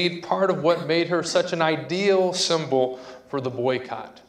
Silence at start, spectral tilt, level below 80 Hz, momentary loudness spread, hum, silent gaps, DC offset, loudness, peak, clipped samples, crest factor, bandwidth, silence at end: 0 s; -4.5 dB/octave; -68 dBFS; 9 LU; none; none; under 0.1%; -23 LUFS; -6 dBFS; under 0.1%; 18 dB; 11.5 kHz; 0.15 s